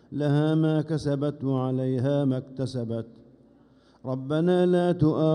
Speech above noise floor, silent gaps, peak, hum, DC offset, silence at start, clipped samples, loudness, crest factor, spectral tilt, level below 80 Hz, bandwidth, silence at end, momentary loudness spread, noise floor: 33 dB; none; -10 dBFS; none; under 0.1%; 0.1 s; under 0.1%; -26 LUFS; 14 dB; -8.5 dB/octave; -58 dBFS; 10.5 kHz; 0 s; 11 LU; -58 dBFS